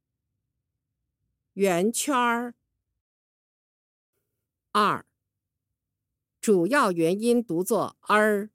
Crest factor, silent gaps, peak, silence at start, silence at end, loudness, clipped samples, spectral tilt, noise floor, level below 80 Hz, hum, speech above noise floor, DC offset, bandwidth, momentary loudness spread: 20 dB; 3.01-4.13 s; -8 dBFS; 1.55 s; 0.05 s; -24 LUFS; under 0.1%; -4.5 dB/octave; -85 dBFS; -80 dBFS; none; 61 dB; under 0.1%; 16.5 kHz; 9 LU